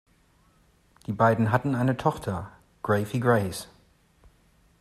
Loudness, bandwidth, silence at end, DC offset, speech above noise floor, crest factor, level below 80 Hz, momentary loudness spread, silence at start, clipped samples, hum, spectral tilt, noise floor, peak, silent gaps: -26 LUFS; 14 kHz; 1.15 s; under 0.1%; 38 dB; 20 dB; -58 dBFS; 16 LU; 1.1 s; under 0.1%; none; -7 dB/octave; -62 dBFS; -8 dBFS; none